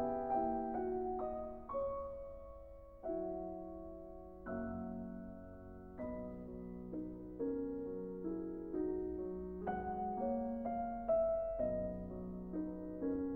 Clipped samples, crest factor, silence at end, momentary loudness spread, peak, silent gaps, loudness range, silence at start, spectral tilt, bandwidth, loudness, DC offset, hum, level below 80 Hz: under 0.1%; 16 dB; 0 s; 14 LU; -26 dBFS; none; 8 LU; 0 s; -11 dB/octave; 3.2 kHz; -42 LUFS; under 0.1%; none; -58 dBFS